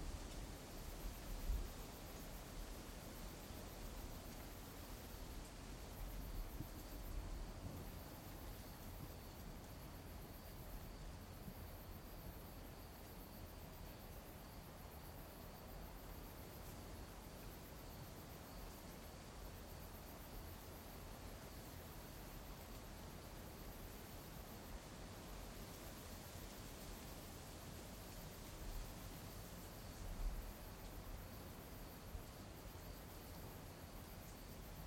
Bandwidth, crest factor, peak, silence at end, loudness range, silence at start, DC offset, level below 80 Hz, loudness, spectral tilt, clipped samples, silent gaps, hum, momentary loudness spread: 16.5 kHz; 20 dB; -32 dBFS; 0 s; 3 LU; 0 s; under 0.1%; -56 dBFS; -54 LUFS; -4.5 dB/octave; under 0.1%; none; none; 3 LU